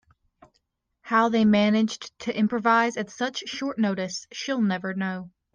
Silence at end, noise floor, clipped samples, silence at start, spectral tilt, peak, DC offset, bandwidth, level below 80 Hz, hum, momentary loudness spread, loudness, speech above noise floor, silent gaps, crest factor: 0.25 s; -73 dBFS; under 0.1%; 1.05 s; -5 dB/octave; -8 dBFS; under 0.1%; 7.4 kHz; -66 dBFS; none; 11 LU; -25 LUFS; 49 dB; none; 18 dB